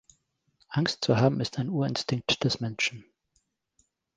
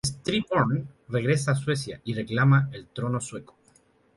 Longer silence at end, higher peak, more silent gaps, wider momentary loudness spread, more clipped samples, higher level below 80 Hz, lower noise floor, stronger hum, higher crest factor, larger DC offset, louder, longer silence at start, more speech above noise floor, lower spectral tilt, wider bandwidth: first, 1.15 s vs 0.75 s; about the same, -8 dBFS vs -8 dBFS; neither; second, 6 LU vs 12 LU; neither; about the same, -60 dBFS vs -56 dBFS; first, -74 dBFS vs -62 dBFS; neither; about the same, 22 dB vs 18 dB; neither; about the same, -28 LUFS vs -26 LUFS; first, 0.7 s vs 0.05 s; first, 47 dB vs 36 dB; about the same, -5 dB/octave vs -5.5 dB/octave; second, 9.8 kHz vs 11.5 kHz